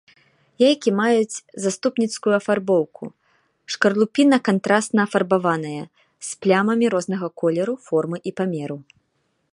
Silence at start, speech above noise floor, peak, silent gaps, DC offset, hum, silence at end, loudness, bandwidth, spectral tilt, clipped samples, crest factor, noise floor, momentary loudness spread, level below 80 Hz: 0.6 s; 49 dB; -2 dBFS; none; under 0.1%; none; 0.7 s; -20 LUFS; 11.5 kHz; -5 dB/octave; under 0.1%; 20 dB; -70 dBFS; 14 LU; -70 dBFS